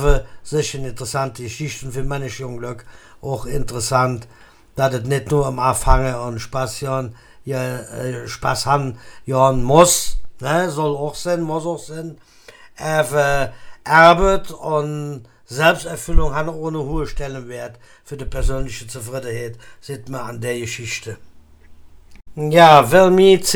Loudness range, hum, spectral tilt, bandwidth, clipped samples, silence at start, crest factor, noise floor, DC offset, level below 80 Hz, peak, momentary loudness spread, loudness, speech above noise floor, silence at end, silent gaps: 11 LU; none; -4.5 dB/octave; 19.5 kHz; under 0.1%; 0 s; 18 dB; -43 dBFS; under 0.1%; -28 dBFS; 0 dBFS; 21 LU; -18 LUFS; 25 dB; 0 s; none